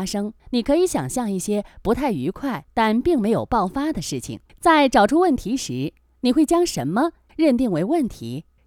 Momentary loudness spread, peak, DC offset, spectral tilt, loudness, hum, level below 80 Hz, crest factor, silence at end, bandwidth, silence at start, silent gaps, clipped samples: 11 LU; -4 dBFS; under 0.1%; -5 dB/octave; -21 LUFS; none; -44 dBFS; 18 dB; 0.25 s; 17.5 kHz; 0 s; none; under 0.1%